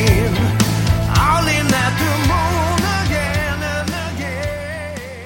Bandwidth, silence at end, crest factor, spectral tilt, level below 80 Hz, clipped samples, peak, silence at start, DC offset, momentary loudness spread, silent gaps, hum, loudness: 17 kHz; 0 s; 16 dB; -5 dB/octave; -28 dBFS; under 0.1%; 0 dBFS; 0 s; under 0.1%; 9 LU; none; none; -17 LUFS